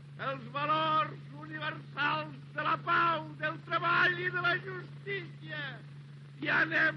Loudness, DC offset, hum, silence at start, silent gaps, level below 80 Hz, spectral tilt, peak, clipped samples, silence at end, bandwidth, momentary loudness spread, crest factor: -32 LUFS; under 0.1%; none; 0 s; none; -86 dBFS; -6 dB/octave; -16 dBFS; under 0.1%; 0 s; 6.6 kHz; 15 LU; 16 dB